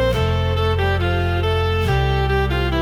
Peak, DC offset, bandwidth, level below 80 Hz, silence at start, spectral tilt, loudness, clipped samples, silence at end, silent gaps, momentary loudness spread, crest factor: -6 dBFS; under 0.1%; 15 kHz; -26 dBFS; 0 s; -6.5 dB/octave; -19 LUFS; under 0.1%; 0 s; none; 1 LU; 12 dB